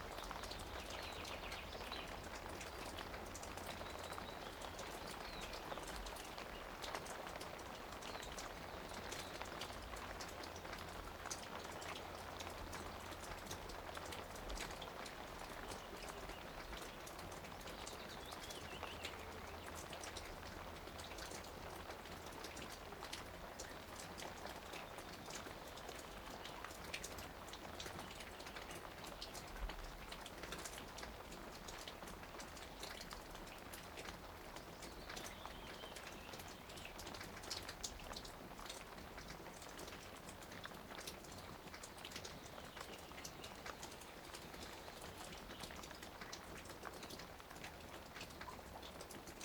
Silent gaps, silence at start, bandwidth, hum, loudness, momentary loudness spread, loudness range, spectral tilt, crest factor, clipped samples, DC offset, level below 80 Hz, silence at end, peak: none; 0 s; over 20 kHz; none; -50 LUFS; 5 LU; 3 LU; -3 dB/octave; 26 dB; under 0.1%; under 0.1%; -60 dBFS; 0 s; -26 dBFS